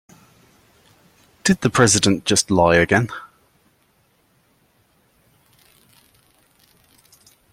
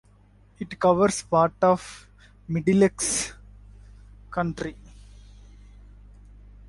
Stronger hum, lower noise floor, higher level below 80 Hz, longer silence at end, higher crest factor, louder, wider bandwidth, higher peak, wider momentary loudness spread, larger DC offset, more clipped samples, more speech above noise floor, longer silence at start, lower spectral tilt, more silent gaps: second, none vs 50 Hz at -45 dBFS; first, -61 dBFS vs -55 dBFS; about the same, -52 dBFS vs -50 dBFS; first, 4.25 s vs 1.95 s; about the same, 22 dB vs 20 dB; first, -17 LUFS vs -24 LUFS; first, 16.5 kHz vs 11.5 kHz; first, -2 dBFS vs -6 dBFS; second, 9 LU vs 17 LU; neither; neither; first, 45 dB vs 33 dB; first, 1.45 s vs 0.6 s; second, -3.5 dB/octave vs -5 dB/octave; neither